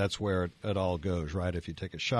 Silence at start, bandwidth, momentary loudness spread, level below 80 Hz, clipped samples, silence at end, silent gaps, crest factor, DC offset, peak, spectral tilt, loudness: 0 s; 10.5 kHz; 5 LU; -50 dBFS; under 0.1%; 0 s; none; 16 dB; under 0.1%; -16 dBFS; -6 dB/octave; -33 LUFS